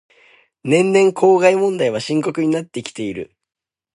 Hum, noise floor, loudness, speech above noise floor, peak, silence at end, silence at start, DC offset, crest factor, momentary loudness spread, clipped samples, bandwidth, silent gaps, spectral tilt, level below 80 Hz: none; -53 dBFS; -16 LUFS; 37 dB; 0 dBFS; 0.7 s; 0.65 s; under 0.1%; 16 dB; 16 LU; under 0.1%; 11.5 kHz; none; -5.5 dB/octave; -62 dBFS